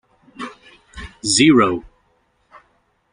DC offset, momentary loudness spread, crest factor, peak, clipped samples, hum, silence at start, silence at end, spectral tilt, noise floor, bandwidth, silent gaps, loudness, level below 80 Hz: under 0.1%; 24 LU; 20 dB; 0 dBFS; under 0.1%; none; 0.4 s; 1.3 s; -3.5 dB/octave; -63 dBFS; 10.5 kHz; none; -15 LUFS; -48 dBFS